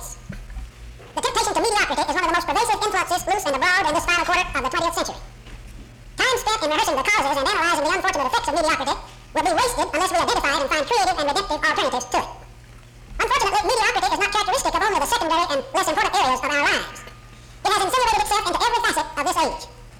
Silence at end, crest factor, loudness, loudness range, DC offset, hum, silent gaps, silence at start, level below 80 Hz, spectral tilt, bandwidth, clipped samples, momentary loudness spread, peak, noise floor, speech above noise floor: 0 s; 14 dB; -20 LUFS; 2 LU; under 0.1%; none; none; 0 s; -42 dBFS; -2 dB/octave; 20 kHz; under 0.1%; 8 LU; -8 dBFS; -44 dBFS; 22 dB